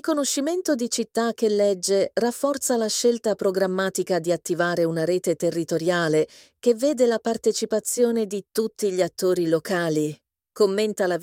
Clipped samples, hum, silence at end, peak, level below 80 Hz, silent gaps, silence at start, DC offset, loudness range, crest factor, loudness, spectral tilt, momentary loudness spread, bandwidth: under 0.1%; none; 0 s; -8 dBFS; -70 dBFS; none; 0.05 s; under 0.1%; 1 LU; 16 dB; -23 LUFS; -4 dB/octave; 4 LU; 17 kHz